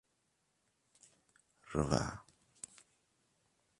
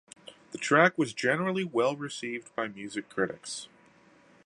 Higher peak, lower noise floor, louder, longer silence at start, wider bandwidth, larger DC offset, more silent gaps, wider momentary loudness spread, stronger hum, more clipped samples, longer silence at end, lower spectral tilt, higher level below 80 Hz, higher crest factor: second, -12 dBFS vs -6 dBFS; first, -80 dBFS vs -60 dBFS; second, -37 LUFS vs -29 LUFS; first, 1.65 s vs 0.25 s; about the same, 11.5 kHz vs 11.5 kHz; neither; neither; about the same, 17 LU vs 19 LU; neither; neither; first, 1.6 s vs 0.8 s; about the same, -5.5 dB/octave vs -4.5 dB/octave; first, -58 dBFS vs -76 dBFS; first, 32 dB vs 24 dB